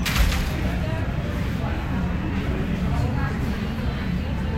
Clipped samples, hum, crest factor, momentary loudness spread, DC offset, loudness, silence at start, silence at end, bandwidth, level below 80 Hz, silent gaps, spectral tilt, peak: under 0.1%; none; 16 dB; 4 LU; under 0.1%; -25 LUFS; 0 s; 0 s; 16 kHz; -28 dBFS; none; -6 dB/octave; -8 dBFS